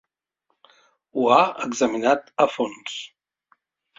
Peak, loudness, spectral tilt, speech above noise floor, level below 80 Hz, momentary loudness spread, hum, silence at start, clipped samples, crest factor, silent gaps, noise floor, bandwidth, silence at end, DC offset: -2 dBFS; -22 LUFS; -3.5 dB/octave; 53 dB; -70 dBFS; 15 LU; none; 1.15 s; under 0.1%; 22 dB; none; -74 dBFS; 8 kHz; 0.95 s; under 0.1%